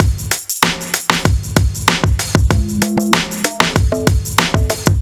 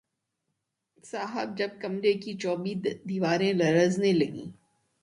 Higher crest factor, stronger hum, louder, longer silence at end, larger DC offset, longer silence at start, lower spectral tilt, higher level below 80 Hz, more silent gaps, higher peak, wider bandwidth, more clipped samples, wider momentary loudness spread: about the same, 14 dB vs 18 dB; neither; first, -15 LUFS vs -28 LUFS; second, 0 s vs 0.5 s; neither; second, 0 s vs 1.05 s; second, -4 dB/octave vs -6 dB/octave; first, -22 dBFS vs -70 dBFS; neither; first, 0 dBFS vs -12 dBFS; first, over 20 kHz vs 11.5 kHz; first, 0.6% vs under 0.1%; second, 2 LU vs 12 LU